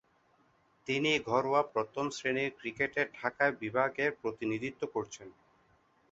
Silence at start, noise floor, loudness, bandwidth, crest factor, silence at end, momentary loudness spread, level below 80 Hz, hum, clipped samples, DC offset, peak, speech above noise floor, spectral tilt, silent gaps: 0.85 s; -69 dBFS; -33 LUFS; 8 kHz; 20 dB; 0.8 s; 8 LU; -70 dBFS; none; under 0.1%; under 0.1%; -14 dBFS; 36 dB; -4.5 dB/octave; none